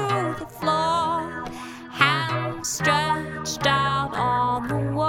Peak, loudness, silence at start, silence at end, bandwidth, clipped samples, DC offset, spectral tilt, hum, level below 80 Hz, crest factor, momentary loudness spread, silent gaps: -2 dBFS; -23 LUFS; 0 s; 0 s; 17.5 kHz; under 0.1%; under 0.1%; -4 dB/octave; none; -50 dBFS; 22 dB; 10 LU; none